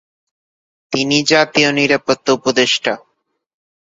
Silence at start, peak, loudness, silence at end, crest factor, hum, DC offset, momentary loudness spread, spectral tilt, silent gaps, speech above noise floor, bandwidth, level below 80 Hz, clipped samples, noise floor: 0.9 s; 0 dBFS; -14 LUFS; 0.9 s; 18 dB; none; under 0.1%; 9 LU; -3 dB/octave; none; over 75 dB; 8 kHz; -58 dBFS; under 0.1%; under -90 dBFS